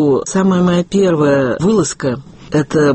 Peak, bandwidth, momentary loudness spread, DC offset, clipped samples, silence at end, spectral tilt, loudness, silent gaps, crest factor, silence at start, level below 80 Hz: -2 dBFS; 8.8 kHz; 7 LU; under 0.1%; under 0.1%; 0 s; -6 dB/octave; -14 LUFS; none; 12 dB; 0 s; -44 dBFS